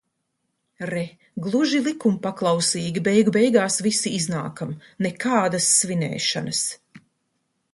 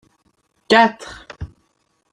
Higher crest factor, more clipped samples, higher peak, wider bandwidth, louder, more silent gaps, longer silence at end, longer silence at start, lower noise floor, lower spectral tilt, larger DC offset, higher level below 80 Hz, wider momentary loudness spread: about the same, 20 dB vs 20 dB; neither; about the same, -4 dBFS vs -2 dBFS; about the same, 11.5 kHz vs 11 kHz; second, -22 LUFS vs -15 LUFS; neither; about the same, 0.75 s vs 0.65 s; about the same, 0.8 s vs 0.7 s; first, -75 dBFS vs -66 dBFS; about the same, -3.5 dB/octave vs -4.5 dB/octave; neither; second, -66 dBFS vs -48 dBFS; second, 13 LU vs 22 LU